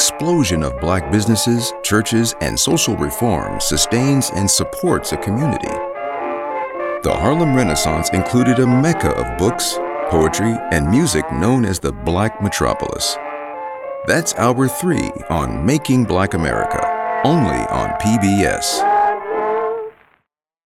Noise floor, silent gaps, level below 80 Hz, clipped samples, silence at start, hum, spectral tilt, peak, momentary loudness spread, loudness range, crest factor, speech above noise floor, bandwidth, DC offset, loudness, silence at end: -69 dBFS; none; -36 dBFS; under 0.1%; 0 s; none; -4.5 dB/octave; -2 dBFS; 8 LU; 3 LU; 16 dB; 52 dB; 17 kHz; under 0.1%; -17 LUFS; 0.75 s